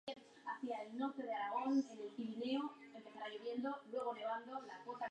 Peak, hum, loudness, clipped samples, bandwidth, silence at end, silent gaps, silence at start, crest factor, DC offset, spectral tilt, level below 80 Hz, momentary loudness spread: -28 dBFS; none; -44 LUFS; under 0.1%; 9.6 kHz; 0 s; none; 0.05 s; 16 dB; under 0.1%; -5 dB/octave; under -90 dBFS; 12 LU